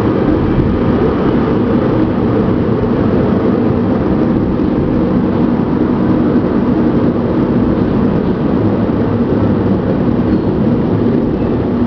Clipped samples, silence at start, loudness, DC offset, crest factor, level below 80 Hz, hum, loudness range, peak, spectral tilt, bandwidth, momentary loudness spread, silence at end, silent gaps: under 0.1%; 0 s; -13 LUFS; under 0.1%; 12 dB; -28 dBFS; none; 0 LU; 0 dBFS; -10.5 dB/octave; 5.4 kHz; 1 LU; 0 s; none